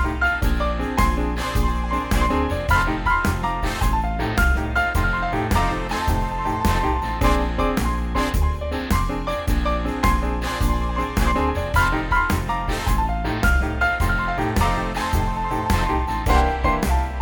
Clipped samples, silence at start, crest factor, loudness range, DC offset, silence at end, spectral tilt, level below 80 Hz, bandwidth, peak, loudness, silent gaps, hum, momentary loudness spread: under 0.1%; 0 s; 16 dB; 1 LU; under 0.1%; 0 s; -5.5 dB/octave; -24 dBFS; over 20 kHz; -4 dBFS; -22 LUFS; none; none; 4 LU